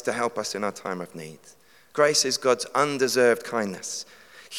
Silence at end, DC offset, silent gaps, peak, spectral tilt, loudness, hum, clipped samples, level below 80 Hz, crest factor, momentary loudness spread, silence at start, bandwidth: 0 s; under 0.1%; none; -6 dBFS; -2.5 dB/octave; -24 LUFS; none; under 0.1%; -78 dBFS; 20 dB; 15 LU; 0 s; 17.5 kHz